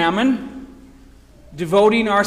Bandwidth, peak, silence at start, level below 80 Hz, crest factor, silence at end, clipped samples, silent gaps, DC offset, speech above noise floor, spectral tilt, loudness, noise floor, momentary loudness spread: 15 kHz; -4 dBFS; 0 s; -48 dBFS; 14 dB; 0 s; under 0.1%; none; under 0.1%; 29 dB; -5.5 dB/octave; -17 LUFS; -45 dBFS; 20 LU